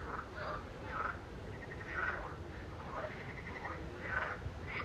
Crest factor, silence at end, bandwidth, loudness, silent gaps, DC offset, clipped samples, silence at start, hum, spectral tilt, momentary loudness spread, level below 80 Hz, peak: 20 dB; 0 s; 14.5 kHz; -43 LUFS; none; under 0.1%; under 0.1%; 0 s; none; -6 dB/octave; 9 LU; -54 dBFS; -24 dBFS